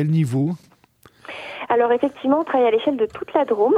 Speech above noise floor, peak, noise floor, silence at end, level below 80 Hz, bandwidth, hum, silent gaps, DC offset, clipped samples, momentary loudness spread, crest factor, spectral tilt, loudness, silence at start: 35 dB; -4 dBFS; -53 dBFS; 0 s; -64 dBFS; 11 kHz; none; none; under 0.1%; under 0.1%; 15 LU; 16 dB; -8 dB/octave; -20 LUFS; 0 s